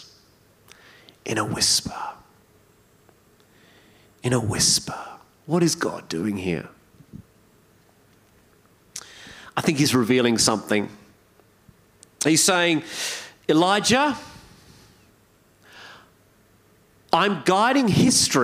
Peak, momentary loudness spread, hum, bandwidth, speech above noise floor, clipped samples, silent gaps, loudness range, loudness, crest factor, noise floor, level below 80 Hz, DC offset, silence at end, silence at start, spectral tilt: -4 dBFS; 20 LU; none; 16 kHz; 37 dB; under 0.1%; none; 8 LU; -21 LUFS; 22 dB; -58 dBFS; -58 dBFS; under 0.1%; 0 s; 0 s; -3.5 dB/octave